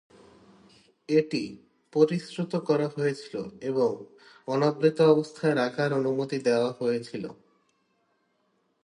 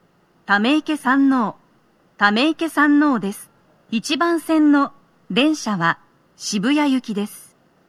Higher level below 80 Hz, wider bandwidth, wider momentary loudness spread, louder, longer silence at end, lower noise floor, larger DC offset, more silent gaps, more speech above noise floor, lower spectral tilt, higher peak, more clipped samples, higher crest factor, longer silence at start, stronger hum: about the same, -74 dBFS vs -72 dBFS; second, 10.5 kHz vs 14 kHz; first, 14 LU vs 11 LU; second, -27 LUFS vs -19 LUFS; first, 1.5 s vs 0.5 s; first, -72 dBFS vs -58 dBFS; neither; neither; first, 46 dB vs 40 dB; first, -6.5 dB/octave vs -4.5 dB/octave; second, -8 dBFS vs -2 dBFS; neither; about the same, 20 dB vs 18 dB; first, 1.1 s vs 0.5 s; neither